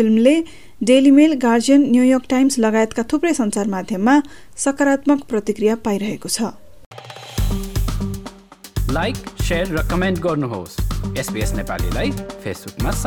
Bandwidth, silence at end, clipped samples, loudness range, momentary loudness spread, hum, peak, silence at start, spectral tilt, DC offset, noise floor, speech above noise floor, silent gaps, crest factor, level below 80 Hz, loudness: 18.5 kHz; 0 s; under 0.1%; 9 LU; 14 LU; none; -2 dBFS; 0 s; -5.5 dB/octave; 1%; -39 dBFS; 22 dB; 6.86-6.91 s; 16 dB; -30 dBFS; -18 LUFS